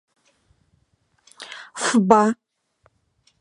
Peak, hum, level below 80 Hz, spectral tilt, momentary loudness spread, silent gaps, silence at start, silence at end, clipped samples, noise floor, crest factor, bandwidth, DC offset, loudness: 0 dBFS; none; -66 dBFS; -4.5 dB/octave; 22 LU; none; 1.4 s; 1.1 s; under 0.1%; -66 dBFS; 24 dB; 11.5 kHz; under 0.1%; -18 LUFS